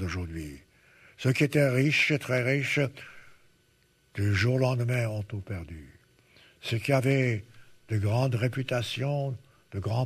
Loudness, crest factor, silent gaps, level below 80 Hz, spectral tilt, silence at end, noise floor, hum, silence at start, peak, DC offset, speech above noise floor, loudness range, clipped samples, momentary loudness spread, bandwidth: -28 LUFS; 18 dB; none; -56 dBFS; -6 dB/octave; 0 s; -66 dBFS; none; 0 s; -10 dBFS; under 0.1%; 39 dB; 4 LU; under 0.1%; 16 LU; 14 kHz